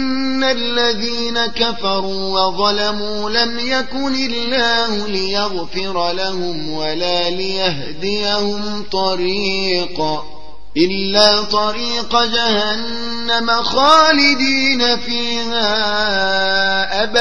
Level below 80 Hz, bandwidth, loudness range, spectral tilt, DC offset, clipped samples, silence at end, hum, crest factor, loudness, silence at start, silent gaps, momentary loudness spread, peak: -44 dBFS; 10.5 kHz; 6 LU; -3 dB/octave; 7%; under 0.1%; 0 s; none; 18 dB; -16 LUFS; 0 s; none; 9 LU; 0 dBFS